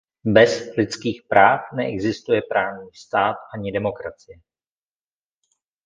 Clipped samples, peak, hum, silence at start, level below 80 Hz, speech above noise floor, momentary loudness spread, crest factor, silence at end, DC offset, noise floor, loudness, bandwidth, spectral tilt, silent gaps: under 0.1%; 0 dBFS; none; 0.25 s; -54 dBFS; over 70 dB; 13 LU; 22 dB; 1.5 s; under 0.1%; under -90 dBFS; -20 LUFS; 9.6 kHz; -5.5 dB/octave; none